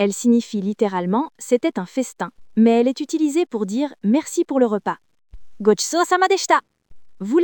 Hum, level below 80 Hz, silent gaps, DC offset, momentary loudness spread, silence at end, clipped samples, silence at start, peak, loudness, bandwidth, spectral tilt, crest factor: none; -56 dBFS; none; under 0.1%; 9 LU; 0 s; under 0.1%; 0 s; -2 dBFS; -20 LUFS; 20 kHz; -4.5 dB/octave; 16 dB